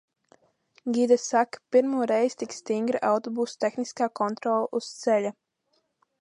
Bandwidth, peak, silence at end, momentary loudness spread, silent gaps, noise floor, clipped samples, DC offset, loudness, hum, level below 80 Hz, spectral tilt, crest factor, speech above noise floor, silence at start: 11 kHz; -8 dBFS; 0.9 s; 8 LU; none; -73 dBFS; under 0.1%; under 0.1%; -26 LUFS; none; -80 dBFS; -4.5 dB/octave; 18 dB; 48 dB; 0.85 s